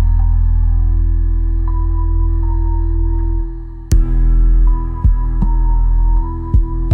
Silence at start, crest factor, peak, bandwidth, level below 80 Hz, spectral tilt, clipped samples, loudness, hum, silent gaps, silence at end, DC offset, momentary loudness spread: 0 s; 10 dB; -2 dBFS; 6.8 kHz; -12 dBFS; -8.5 dB/octave; under 0.1%; -17 LUFS; none; none; 0 s; under 0.1%; 4 LU